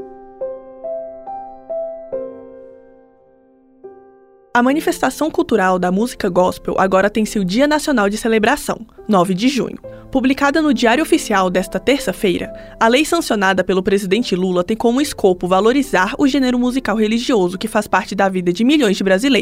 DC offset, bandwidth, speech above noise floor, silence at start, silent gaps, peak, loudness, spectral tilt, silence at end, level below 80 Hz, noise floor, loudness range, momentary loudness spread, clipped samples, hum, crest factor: under 0.1%; 16 kHz; 35 dB; 0 s; none; -2 dBFS; -16 LUFS; -5 dB/octave; 0 s; -42 dBFS; -50 dBFS; 10 LU; 13 LU; under 0.1%; none; 16 dB